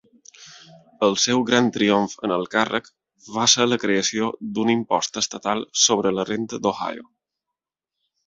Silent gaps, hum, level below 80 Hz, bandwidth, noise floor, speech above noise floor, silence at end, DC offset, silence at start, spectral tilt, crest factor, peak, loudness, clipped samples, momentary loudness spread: none; none; -62 dBFS; 8 kHz; -86 dBFS; 64 dB; 1.25 s; under 0.1%; 0.4 s; -2.5 dB/octave; 20 dB; -2 dBFS; -21 LUFS; under 0.1%; 9 LU